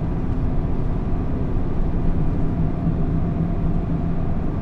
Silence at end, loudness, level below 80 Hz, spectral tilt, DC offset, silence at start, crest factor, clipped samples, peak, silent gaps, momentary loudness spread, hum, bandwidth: 0 s; -24 LUFS; -24 dBFS; -10.5 dB/octave; under 0.1%; 0 s; 12 dB; under 0.1%; -8 dBFS; none; 2 LU; none; 3.9 kHz